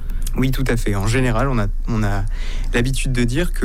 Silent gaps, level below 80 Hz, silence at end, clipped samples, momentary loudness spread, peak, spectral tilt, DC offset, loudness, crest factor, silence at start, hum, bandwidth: none; -20 dBFS; 0 s; under 0.1%; 6 LU; -8 dBFS; -6 dB/octave; under 0.1%; -21 LUFS; 10 dB; 0 s; none; 15.5 kHz